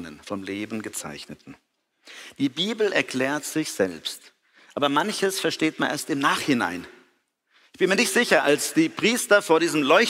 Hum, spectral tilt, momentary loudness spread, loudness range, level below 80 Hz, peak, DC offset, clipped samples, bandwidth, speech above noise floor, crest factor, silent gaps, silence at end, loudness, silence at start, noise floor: none; -3 dB/octave; 17 LU; 6 LU; -68 dBFS; -4 dBFS; under 0.1%; under 0.1%; 16 kHz; 44 dB; 22 dB; none; 0 s; -23 LUFS; 0 s; -67 dBFS